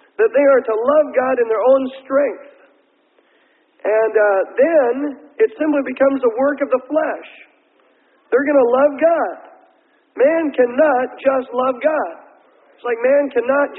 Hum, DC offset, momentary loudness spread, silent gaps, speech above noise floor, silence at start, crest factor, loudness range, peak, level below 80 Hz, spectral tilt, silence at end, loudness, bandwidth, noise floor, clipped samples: none; under 0.1%; 10 LU; none; 42 dB; 0.2 s; 14 dB; 2 LU; -2 dBFS; -68 dBFS; -9.5 dB/octave; 0 s; -16 LUFS; 4 kHz; -58 dBFS; under 0.1%